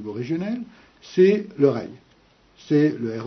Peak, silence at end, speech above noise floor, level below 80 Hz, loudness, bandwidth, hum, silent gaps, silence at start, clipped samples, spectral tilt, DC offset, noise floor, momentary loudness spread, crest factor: -6 dBFS; 0 s; 36 dB; -66 dBFS; -22 LUFS; 6.4 kHz; none; none; 0 s; under 0.1%; -8 dB/octave; under 0.1%; -57 dBFS; 14 LU; 18 dB